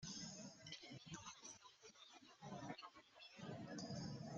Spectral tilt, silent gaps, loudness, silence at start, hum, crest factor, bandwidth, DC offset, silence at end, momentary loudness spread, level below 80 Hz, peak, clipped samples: -4 dB/octave; none; -55 LUFS; 0 s; none; 20 dB; 8.8 kHz; under 0.1%; 0 s; 11 LU; -80 dBFS; -36 dBFS; under 0.1%